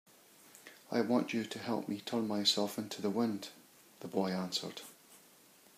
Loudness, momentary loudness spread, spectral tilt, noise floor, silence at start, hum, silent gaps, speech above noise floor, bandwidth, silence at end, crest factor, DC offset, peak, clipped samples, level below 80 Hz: -35 LUFS; 19 LU; -4 dB/octave; -62 dBFS; 0.45 s; none; none; 27 dB; 15.5 kHz; 0.6 s; 20 dB; under 0.1%; -16 dBFS; under 0.1%; -84 dBFS